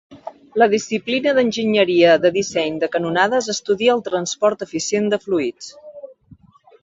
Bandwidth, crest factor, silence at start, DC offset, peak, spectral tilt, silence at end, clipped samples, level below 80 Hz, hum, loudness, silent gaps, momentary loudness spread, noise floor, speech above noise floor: 8 kHz; 18 dB; 0.1 s; under 0.1%; -2 dBFS; -4 dB/octave; 0.75 s; under 0.1%; -60 dBFS; none; -18 LUFS; none; 15 LU; -49 dBFS; 31 dB